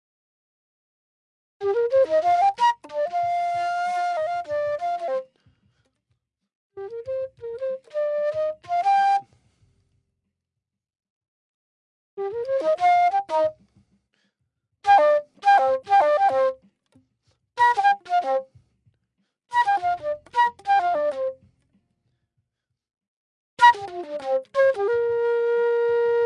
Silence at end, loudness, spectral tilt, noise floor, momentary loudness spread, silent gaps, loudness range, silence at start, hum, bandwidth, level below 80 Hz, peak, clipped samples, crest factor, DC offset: 0 s; -22 LUFS; -3 dB/octave; -85 dBFS; 13 LU; 6.55-6.70 s, 11.10-11.21 s, 11.28-12.17 s, 23.08-23.57 s; 9 LU; 1.6 s; none; 11 kHz; -70 dBFS; -4 dBFS; under 0.1%; 20 dB; under 0.1%